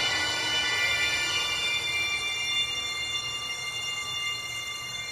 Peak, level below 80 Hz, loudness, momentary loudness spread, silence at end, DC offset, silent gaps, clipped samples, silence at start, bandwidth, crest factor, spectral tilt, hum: -14 dBFS; -56 dBFS; -27 LUFS; 7 LU; 0 s; under 0.1%; none; under 0.1%; 0 s; 16 kHz; 16 dB; 0 dB/octave; none